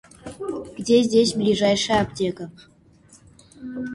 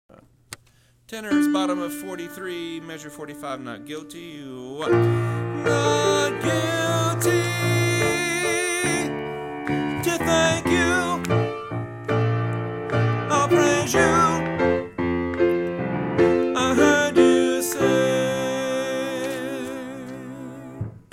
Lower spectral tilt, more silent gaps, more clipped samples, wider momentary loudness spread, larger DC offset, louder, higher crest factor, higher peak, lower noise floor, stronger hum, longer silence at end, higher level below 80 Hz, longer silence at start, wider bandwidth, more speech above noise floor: about the same, -4.5 dB/octave vs -5 dB/octave; neither; neither; about the same, 19 LU vs 17 LU; neither; about the same, -21 LUFS vs -22 LUFS; about the same, 18 dB vs 18 dB; about the same, -6 dBFS vs -4 dBFS; second, -53 dBFS vs -57 dBFS; neither; second, 0 s vs 0.15 s; about the same, -52 dBFS vs -50 dBFS; second, 0.25 s vs 0.5 s; second, 11.5 kHz vs 16 kHz; about the same, 32 dB vs 33 dB